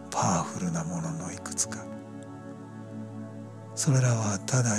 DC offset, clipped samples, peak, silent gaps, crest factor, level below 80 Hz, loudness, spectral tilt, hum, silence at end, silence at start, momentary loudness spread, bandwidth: under 0.1%; under 0.1%; -12 dBFS; none; 18 dB; -64 dBFS; -29 LUFS; -5 dB/octave; none; 0 s; 0 s; 18 LU; 14 kHz